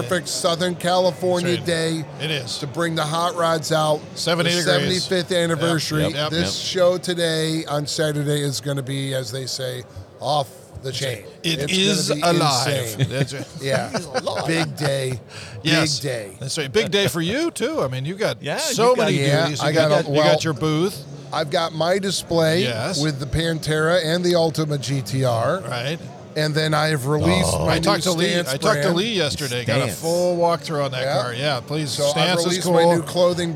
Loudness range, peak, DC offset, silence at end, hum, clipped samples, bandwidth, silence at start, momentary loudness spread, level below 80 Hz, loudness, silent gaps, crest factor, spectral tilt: 3 LU; -4 dBFS; under 0.1%; 0 s; none; under 0.1%; 17.5 kHz; 0 s; 8 LU; -50 dBFS; -21 LUFS; none; 18 dB; -4.5 dB/octave